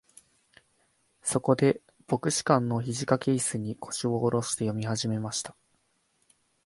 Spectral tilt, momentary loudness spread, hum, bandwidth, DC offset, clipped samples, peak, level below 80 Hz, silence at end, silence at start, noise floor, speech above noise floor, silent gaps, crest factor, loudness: -5 dB/octave; 10 LU; none; 11.5 kHz; under 0.1%; under 0.1%; -6 dBFS; -64 dBFS; 1.15 s; 1.25 s; -72 dBFS; 44 dB; none; 22 dB; -28 LUFS